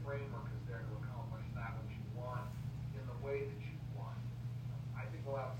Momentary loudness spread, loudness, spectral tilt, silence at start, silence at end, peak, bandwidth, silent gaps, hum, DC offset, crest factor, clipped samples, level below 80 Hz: 3 LU; -45 LUFS; -8 dB/octave; 0 s; 0 s; -30 dBFS; 15.5 kHz; none; none; under 0.1%; 14 dB; under 0.1%; -58 dBFS